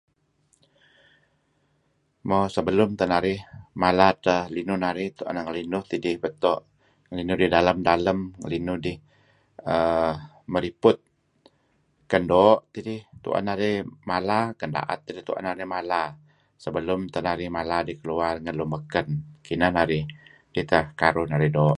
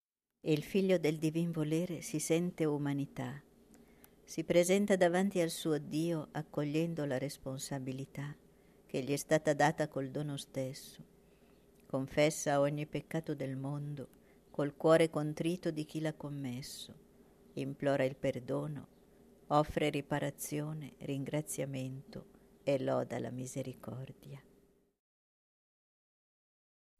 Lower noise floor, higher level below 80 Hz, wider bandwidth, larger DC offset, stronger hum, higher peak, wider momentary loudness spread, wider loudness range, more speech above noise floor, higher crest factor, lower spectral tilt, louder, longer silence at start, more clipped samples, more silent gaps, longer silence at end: about the same, -69 dBFS vs -69 dBFS; first, -50 dBFS vs -66 dBFS; second, 11.5 kHz vs 14 kHz; neither; neither; first, -2 dBFS vs -16 dBFS; about the same, 13 LU vs 15 LU; about the same, 5 LU vs 6 LU; first, 45 dB vs 34 dB; about the same, 24 dB vs 20 dB; first, -7 dB/octave vs -5.5 dB/octave; first, -25 LUFS vs -35 LUFS; first, 2.25 s vs 0.45 s; neither; neither; second, 0 s vs 2.6 s